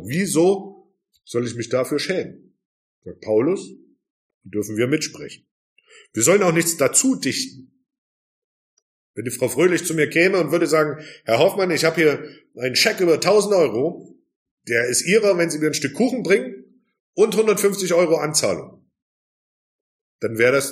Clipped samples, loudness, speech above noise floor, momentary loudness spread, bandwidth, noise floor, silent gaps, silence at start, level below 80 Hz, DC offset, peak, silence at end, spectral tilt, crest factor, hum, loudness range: under 0.1%; -19 LUFS; 34 dB; 13 LU; 15.5 kHz; -53 dBFS; 2.65-3.02 s, 4.10-4.41 s, 5.51-5.76 s, 7.98-9.14 s, 14.36-14.57 s, 17.00-17.13 s, 19.02-20.19 s; 0 s; -66 dBFS; under 0.1%; -2 dBFS; 0 s; -3.5 dB/octave; 20 dB; none; 7 LU